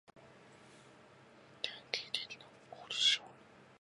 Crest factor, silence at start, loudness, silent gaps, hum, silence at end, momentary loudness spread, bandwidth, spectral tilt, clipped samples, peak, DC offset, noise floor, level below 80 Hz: 28 dB; 0.15 s; -35 LUFS; none; none; 0.15 s; 25 LU; 11.5 kHz; 0.5 dB/octave; under 0.1%; -14 dBFS; under 0.1%; -61 dBFS; -84 dBFS